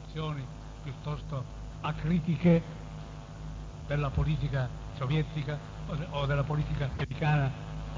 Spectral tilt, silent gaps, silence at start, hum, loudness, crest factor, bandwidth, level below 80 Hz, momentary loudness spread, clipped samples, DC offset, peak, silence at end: -8 dB/octave; none; 0 s; none; -32 LUFS; 18 dB; 7.6 kHz; -42 dBFS; 15 LU; under 0.1%; under 0.1%; -12 dBFS; 0 s